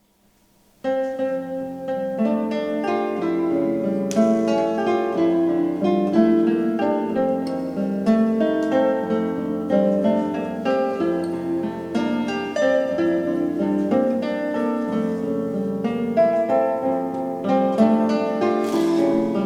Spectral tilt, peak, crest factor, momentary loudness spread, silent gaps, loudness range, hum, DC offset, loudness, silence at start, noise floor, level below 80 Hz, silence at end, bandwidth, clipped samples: -7 dB/octave; -4 dBFS; 16 dB; 7 LU; none; 3 LU; none; under 0.1%; -21 LUFS; 0.85 s; -60 dBFS; -62 dBFS; 0 s; 13 kHz; under 0.1%